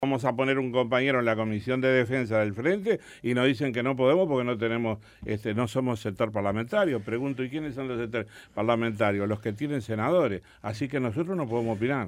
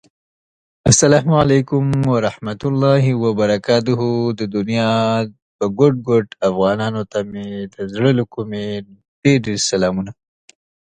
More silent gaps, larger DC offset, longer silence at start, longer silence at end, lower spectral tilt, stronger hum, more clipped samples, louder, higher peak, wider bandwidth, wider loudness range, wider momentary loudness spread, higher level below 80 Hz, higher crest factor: second, none vs 5.42-5.59 s, 9.08-9.22 s; neither; second, 0 s vs 0.85 s; second, 0 s vs 0.85 s; first, -7 dB/octave vs -5.5 dB/octave; neither; neither; second, -27 LUFS vs -17 LUFS; second, -10 dBFS vs 0 dBFS; first, 15.5 kHz vs 10.5 kHz; about the same, 4 LU vs 4 LU; second, 8 LU vs 12 LU; second, -60 dBFS vs -46 dBFS; about the same, 16 dB vs 18 dB